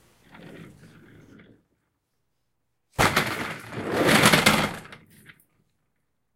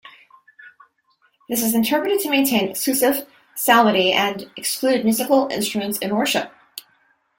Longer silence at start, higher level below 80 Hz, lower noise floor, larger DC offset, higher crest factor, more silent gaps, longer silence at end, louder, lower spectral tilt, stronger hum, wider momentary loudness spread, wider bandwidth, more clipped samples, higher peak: first, 0.4 s vs 0.05 s; first, -52 dBFS vs -64 dBFS; first, -78 dBFS vs -63 dBFS; neither; first, 26 dB vs 18 dB; neither; first, 1.4 s vs 0.6 s; about the same, -21 LUFS vs -19 LUFS; about the same, -3.5 dB/octave vs -3 dB/octave; neither; first, 17 LU vs 11 LU; about the same, 16.5 kHz vs 17 kHz; neither; about the same, -2 dBFS vs -2 dBFS